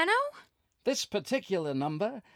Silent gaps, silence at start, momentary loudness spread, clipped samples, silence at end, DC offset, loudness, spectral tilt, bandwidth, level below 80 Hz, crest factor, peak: none; 0 s; 6 LU; under 0.1%; 0.15 s; under 0.1%; -32 LUFS; -4 dB/octave; 17 kHz; -76 dBFS; 18 dB; -14 dBFS